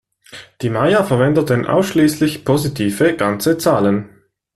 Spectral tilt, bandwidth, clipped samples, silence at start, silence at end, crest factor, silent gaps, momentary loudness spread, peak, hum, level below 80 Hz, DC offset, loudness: -6 dB/octave; 14 kHz; under 0.1%; 0.35 s; 0.5 s; 14 dB; none; 5 LU; -2 dBFS; none; -48 dBFS; under 0.1%; -16 LUFS